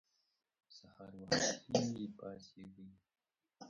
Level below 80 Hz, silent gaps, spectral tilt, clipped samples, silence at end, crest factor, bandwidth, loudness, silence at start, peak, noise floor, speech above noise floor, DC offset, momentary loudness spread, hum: -74 dBFS; none; -3.5 dB/octave; under 0.1%; 0 s; 26 dB; 11 kHz; -37 LUFS; 0.7 s; -18 dBFS; -62 dBFS; 21 dB; under 0.1%; 25 LU; none